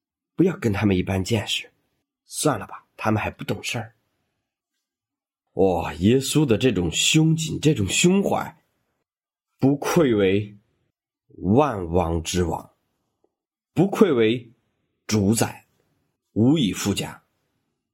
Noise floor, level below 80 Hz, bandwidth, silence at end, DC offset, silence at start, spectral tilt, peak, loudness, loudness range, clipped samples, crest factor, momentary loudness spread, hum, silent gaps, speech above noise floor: under -90 dBFS; -52 dBFS; 16.5 kHz; 0.8 s; under 0.1%; 0.4 s; -5 dB/octave; -2 dBFS; -22 LUFS; 7 LU; under 0.1%; 22 dB; 12 LU; none; none; over 69 dB